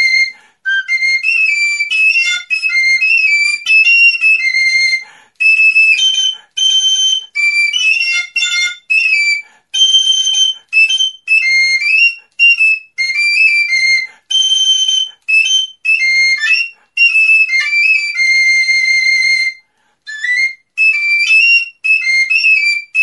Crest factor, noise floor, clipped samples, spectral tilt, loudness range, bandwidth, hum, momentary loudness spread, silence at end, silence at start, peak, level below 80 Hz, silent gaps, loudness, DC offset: 12 dB; -51 dBFS; under 0.1%; 7 dB/octave; 2 LU; 11.5 kHz; none; 7 LU; 0 s; 0 s; 0 dBFS; -80 dBFS; none; -9 LUFS; under 0.1%